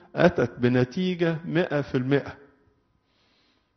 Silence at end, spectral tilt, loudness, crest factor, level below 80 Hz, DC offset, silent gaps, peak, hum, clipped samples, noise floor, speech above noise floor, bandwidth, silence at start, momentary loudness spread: 1.4 s; -6 dB/octave; -25 LUFS; 20 dB; -56 dBFS; under 0.1%; none; -6 dBFS; none; under 0.1%; -68 dBFS; 44 dB; 6.4 kHz; 0.15 s; 5 LU